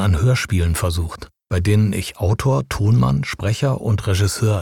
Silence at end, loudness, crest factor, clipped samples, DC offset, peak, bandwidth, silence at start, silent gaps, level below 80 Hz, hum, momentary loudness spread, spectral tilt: 0 s; -19 LUFS; 12 dB; under 0.1%; 0.3%; -6 dBFS; 16.5 kHz; 0 s; none; -32 dBFS; none; 6 LU; -6 dB/octave